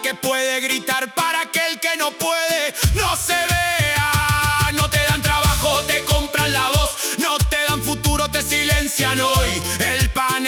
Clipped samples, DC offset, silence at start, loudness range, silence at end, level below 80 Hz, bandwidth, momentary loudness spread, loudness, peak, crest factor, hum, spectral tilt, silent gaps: under 0.1%; under 0.1%; 0 s; 2 LU; 0 s; -30 dBFS; over 20 kHz; 3 LU; -18 LUFS; -4 dBFS; 14 dB; none; -3 dB/octave; none